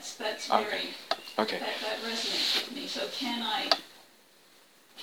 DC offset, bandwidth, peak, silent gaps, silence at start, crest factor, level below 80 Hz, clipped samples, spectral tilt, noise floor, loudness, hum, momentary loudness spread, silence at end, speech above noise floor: under 0.1%; 20 kHz; -4 dBFS; none; 0 s; 30 dB; -84 dBFS; under 0.1%; -1.5 dB/octave; -60 dBFS; -30 LUFS; none; 7 LU; 0 s; 28 dB